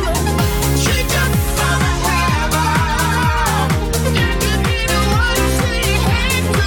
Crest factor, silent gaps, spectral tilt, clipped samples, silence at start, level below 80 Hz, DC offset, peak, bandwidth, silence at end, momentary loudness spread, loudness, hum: 12 dB; none; -4 dB/octave; under 0.1%; 0 s; -22 dBFS; under 0.1%; -4 dBFS; 19 kHz; 0 s; 2 LU; -16 LUFS; none